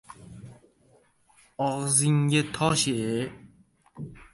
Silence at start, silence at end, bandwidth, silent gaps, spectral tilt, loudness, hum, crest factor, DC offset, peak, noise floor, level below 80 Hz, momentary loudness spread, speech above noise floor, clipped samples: 0.1 s; 0.1 s; 11.5 kHz; none; -4 dB/octave; -25 LUFS; none; 20 dB; under 0.1%; -8 dBFS; -62 dBFS; -58 dBFS; 25 LU; 37 dB; under 0.1%